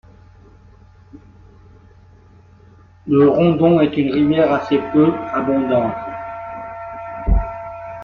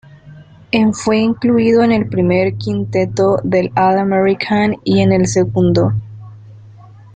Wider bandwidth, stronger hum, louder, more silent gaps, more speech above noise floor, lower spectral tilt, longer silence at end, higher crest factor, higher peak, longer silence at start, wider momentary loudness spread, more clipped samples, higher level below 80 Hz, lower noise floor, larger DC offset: second, 6.2 kHz vs 9.2 kHz; neither; second, -17 LUFS vs -14 LUFS; neither; first, 32 dB vs 26 dB; first, -9.5 dB/octave vs -6.5 dB/octave; second, 0 s vs 0.45 s; about the same, 16 dB vs 14 dB; about the same, -2 dBFS vs -2 dBFS; first, 1.15 s vs 0.25 s; first, 17 LU vs 6 LU; neither; first, -30 dBFS vs -46 dBFS; first, -46 dBFS vs -39 dBFS; neither